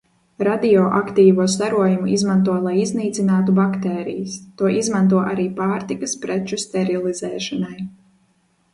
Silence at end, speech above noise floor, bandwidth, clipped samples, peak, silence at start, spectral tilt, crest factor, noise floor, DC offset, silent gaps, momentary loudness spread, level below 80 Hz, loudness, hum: 0.85 s; 44 dB; 11.5 kHz; under 0.1%; -2 dBFS; 0.4 s; -6 dB/octave; 16 dB; -62 dBFS; under 0.1%; none; 10 LU; -58 dBFS; -19 LUFS; none